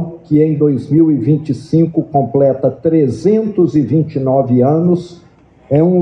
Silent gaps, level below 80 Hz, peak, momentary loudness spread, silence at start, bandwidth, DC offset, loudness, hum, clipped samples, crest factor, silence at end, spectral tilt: none; -50 dBFS; 0 dBFS; 4 LU; 0 s; 9 kHz; under 0.1%; -13 LUFS; none; under 0.1%; 12 dB; 0 s; -10.5 dB/octave